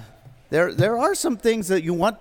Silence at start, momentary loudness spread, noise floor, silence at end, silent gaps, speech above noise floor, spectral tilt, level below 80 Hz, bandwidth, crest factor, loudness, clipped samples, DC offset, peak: 0 s; 3 LU; -47 dBFS; 0.05 s; none; 26 dB; -5 dB/octave; -52 dBFS; 18 kHz; 16 dB; -21 LUFS; under 0.1%; under 0.1%; -6 dBFS